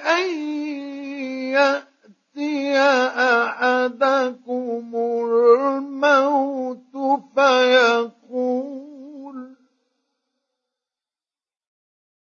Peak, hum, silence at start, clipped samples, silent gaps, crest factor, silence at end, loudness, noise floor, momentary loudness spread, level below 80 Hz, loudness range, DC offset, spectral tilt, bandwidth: -2 dBFS; none; 0 s; under 0.1%; none; 20 dB; 2.75 s; -20 LUFS; under -90 dBFS; 15 LU; -86 dBFS; 7 LU; under 0.1%; -2.5 dB/octave; 7.2 kHz